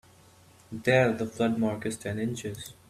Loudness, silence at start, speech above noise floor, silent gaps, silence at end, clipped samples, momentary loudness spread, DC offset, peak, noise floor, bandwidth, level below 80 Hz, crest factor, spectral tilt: -28 LUFS; 0.7 s; 28 dB; none; 0.15 s; under 0.1%; 13 LU; under 0.1%; -8 dBFS; -57 dBFS; 15 kHz; -62 dBFS; 22 dB; -5.5 dB/octave